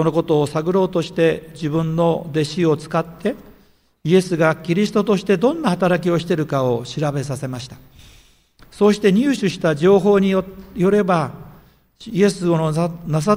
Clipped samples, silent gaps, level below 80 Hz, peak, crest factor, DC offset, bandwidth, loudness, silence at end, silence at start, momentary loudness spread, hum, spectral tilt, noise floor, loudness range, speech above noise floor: under 0.1%; none; -50 dBFS; -2 dBFS; 16 dB; under 0.1%; 16 kHz; -18 LUFS; 0 s; 0 s; 10 LU; none; -6.5 dB/octave; -54 dBFS; 4 LU; 37 dB